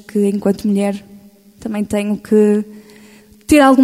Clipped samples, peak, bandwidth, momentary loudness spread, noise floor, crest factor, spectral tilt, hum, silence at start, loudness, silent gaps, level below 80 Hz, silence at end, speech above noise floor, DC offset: under 0.1%; 0 dBFS; 15.5 kHz; 18 LU; -44 dBFS; 16 dB; -6 dB/octave; none; 0.15 s; -15 LUFS; none; -46 dBFS; 0 s; 30 dB; under 0.1%